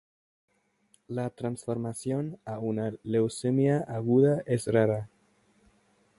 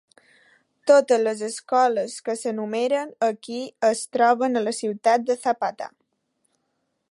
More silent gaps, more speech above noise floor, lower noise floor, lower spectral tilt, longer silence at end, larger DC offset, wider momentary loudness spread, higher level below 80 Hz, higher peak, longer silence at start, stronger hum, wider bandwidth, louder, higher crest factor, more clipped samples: neither; second, 41 dB vs 52 dB; second, -68 dBFS vs -74 dBFS; first, -7.5 dB/octave vs -3.5 dB/octave; about the same, 1.15 s vs 1.25 s; neither; about the same, 11 LU vs 12 LU; first, -64 dBFS vs -80 dBFS; second, -10 dBFS vs -4 dBFS; first, 1.1 s vs 0.85 s; neither; about the same, 11.5 kHz vs 11.5 kHz; second, -29 LUFS vs -23 LUFS; about the same, 20 dB vs 18 dB; neither